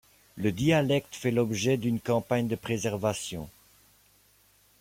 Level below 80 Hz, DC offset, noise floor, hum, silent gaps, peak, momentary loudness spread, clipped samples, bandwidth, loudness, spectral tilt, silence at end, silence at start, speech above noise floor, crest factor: -60 dBFS; under 0.1%; -63 dBFS; none; none; -12 dBFS; 9 LU; under 0.1%; 16.5 kHz; -28 LUFS; -5.5 dB/octave; 1.3 s; 0.35 s; 35 dB; 18 dB